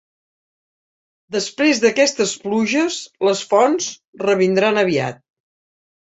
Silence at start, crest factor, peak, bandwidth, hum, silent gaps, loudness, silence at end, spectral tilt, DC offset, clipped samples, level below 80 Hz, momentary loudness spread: 1.3 s; 18 dB; -2 dBFS; 8.2 kHz; none; 4.07-4.13 s; -18 LUFS; 0.95 s; -3.5 dB/octave; under 0.1%; under 0.1%; -64 dBFS; 9 LU